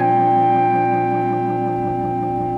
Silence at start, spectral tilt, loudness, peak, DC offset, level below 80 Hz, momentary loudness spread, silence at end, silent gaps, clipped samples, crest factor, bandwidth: 0 s; -9.5 dB/octave; -18 LUFS; -6 dBFS; under 0.1%; -48 dBFS; 6 LU; 0 s; none; under 0.1%; 10 dB; 5 kHz